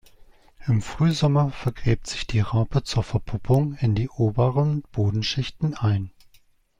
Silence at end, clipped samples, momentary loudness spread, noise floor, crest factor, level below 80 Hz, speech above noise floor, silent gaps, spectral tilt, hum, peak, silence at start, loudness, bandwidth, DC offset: 0.7 s; under 0.1%; 6 LU; -58 dBFS; 18 dB; -40 dBFS; 35 dB; none; -6.5 dB/octave; none; -6 dBFS; 0.2 s; -24 LUFS; 10.5 kHz; under 0.1%